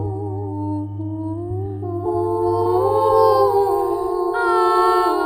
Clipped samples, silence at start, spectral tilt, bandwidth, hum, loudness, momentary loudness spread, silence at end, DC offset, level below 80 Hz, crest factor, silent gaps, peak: under 0.1%; 0 s; -7.5 dB/octave; 16 kHz; none; -19 LUFS; 12 LU; 0 s; under 0.1%; -48 dBFS; 16 dB; none; -4 dBFS